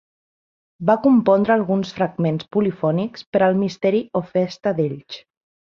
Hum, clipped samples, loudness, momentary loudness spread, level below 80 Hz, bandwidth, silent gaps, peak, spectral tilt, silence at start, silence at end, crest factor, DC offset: none; under 0.1%; -20 LUFS; 9 LU; -60 dBFS; 7.2 kHz; 3.27-3.33 s; -2 dBFS; -8 dB/octave; 0.8 s; 0.6 s; 18 dB; under 0.1%